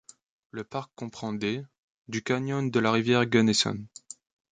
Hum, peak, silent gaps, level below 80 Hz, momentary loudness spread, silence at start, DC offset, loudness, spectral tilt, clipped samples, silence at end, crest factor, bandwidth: none; -8 dBFS; 1.78-2.05 s; -66 dBFS; 21 LU; 0.55 s; under 0.1%; -27 LUFS; -4.5 dB/octave; under 0.1%; 0.65 s; 20 dB; 9.4 kHz